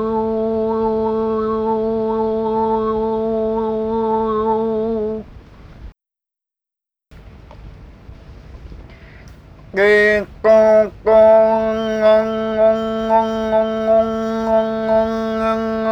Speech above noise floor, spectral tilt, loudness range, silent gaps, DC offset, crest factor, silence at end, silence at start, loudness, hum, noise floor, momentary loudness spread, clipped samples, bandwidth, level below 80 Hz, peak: 75 dB; -6.5 dB/octave; 10 LU; none; under 0.1%; 16 dB; 0 s; 0 s; -16 LUFS; none; -87 dBFS; 8 LU; under 0.1%; 8.6 kHz; -42 dBFS; -2 dBFS